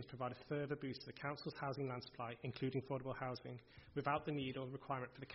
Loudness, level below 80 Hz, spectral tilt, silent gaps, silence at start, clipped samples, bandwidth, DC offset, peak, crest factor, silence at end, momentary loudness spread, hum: -46 LUFS; -72 dBFS; -5 dB/octave; none; 0 s; under 0.1%; 5.8 kHz; under 0.1%; -24 dBFS; 20 dB; 0 s; 8 LU; none